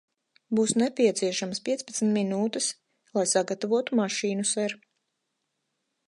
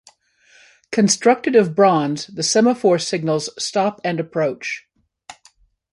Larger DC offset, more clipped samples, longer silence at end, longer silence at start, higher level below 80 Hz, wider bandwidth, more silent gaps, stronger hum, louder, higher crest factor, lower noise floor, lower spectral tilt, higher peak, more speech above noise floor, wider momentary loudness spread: neither; neither; first, 1.3 s vs 0.6 s; second, 0.5 s vs 0.9 s; second, -78 dBFS vs -66 dBFS; about the same, 11.5 kHz vs 11.5 kHz; neither; neither; second, -27 LUFS vs -18 LUFS; about the same, 18 dB vs 18 dB; first, -80 dBFS vs -55 dBFS; about the same, -3.5 dB/octave vs -4 dB/octave; second, -10 dBFS vs -2 dBFS; first, 54 dB vs 38 dB; second, 6 LU vs 10 LU